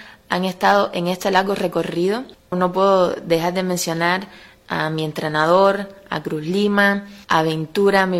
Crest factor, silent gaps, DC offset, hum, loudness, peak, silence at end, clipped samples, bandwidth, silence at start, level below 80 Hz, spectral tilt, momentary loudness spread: 18 dB; none; under 0.1%; none; -19 LUFS; -2 dBFS; 0 s; under 0.1%; 16.5 kHz; 0 s; -56 dBFS; -5 dB/octave; 10 LU